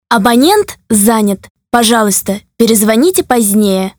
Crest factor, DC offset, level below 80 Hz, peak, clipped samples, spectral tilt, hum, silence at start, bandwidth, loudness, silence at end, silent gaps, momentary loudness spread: 10 dB; under 0.1%; -44 dBFS; 0 dBFS; 0.6%; -3.5 dB/octave; none; 0.1 s; over 20 kHz; -10 LUFS; 0.1 s; 1.50-1.55 s; 6 LU